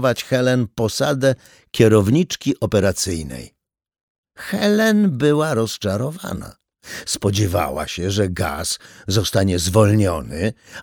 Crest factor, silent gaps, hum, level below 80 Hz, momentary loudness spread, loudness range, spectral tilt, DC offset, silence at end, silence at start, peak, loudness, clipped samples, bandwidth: 18 dB; 4.03-4.24 s; none; -42 dBFS; 14 LU; 4 LU; -5.5 dB/octave; under 0.1%; 0 s; 0 s; 0 dBFS; -19 LUFS; under 0.1%; over 20 kHz